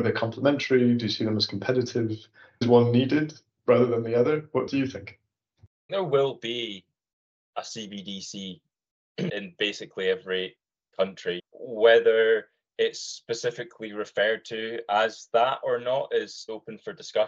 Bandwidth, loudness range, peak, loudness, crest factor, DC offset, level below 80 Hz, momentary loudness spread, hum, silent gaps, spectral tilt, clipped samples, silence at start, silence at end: 7.8 kHz; 8 LU; -6 dBFS; -26 LUFS; 20 dB; under 0.1%; -72 dBFS; 17 LU; none; 5.67-5.89 s, 7.13-7.53 s, 8.91-9.15 s; -5.5 dB/octave; under 0.1%; 0 s; 0 s